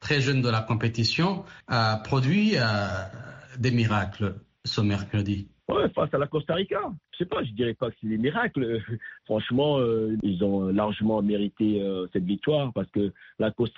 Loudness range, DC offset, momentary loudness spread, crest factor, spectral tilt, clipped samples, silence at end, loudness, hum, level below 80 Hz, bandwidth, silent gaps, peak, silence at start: 3 LU; under 0.1%; 8 LU; 14 dB; -5 dB/octave; under 0.1%; 0.1 s; -26 LUFS; none; -56 dBFS; 7.6 kHz; none; -12 dBFS; 0 s